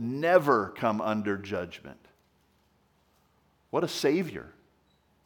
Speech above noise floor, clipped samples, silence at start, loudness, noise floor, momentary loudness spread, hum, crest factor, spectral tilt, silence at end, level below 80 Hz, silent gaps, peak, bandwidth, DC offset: 40 dB; under 0.1%; 0 s; -28 LUFS; -68 dBFS; 18 LU; none; 24 dB; -5.5 dB/octave; 0.75 s; -70 dBFS; none; -6 dBFS; over 20 kHz; under 0.1%